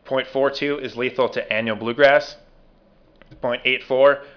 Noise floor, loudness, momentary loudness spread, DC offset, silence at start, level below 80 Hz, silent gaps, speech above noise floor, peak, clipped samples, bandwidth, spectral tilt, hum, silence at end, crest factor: -54 dBFS; -20 LUFS; 9 LU; under 0.1%; 0.05 s; -56 dBFS; none; 34 dB; -4 dBFS; under 0.1%; 5.4 kHz; -5 dB/octave; none; 0.1 s; 18 dB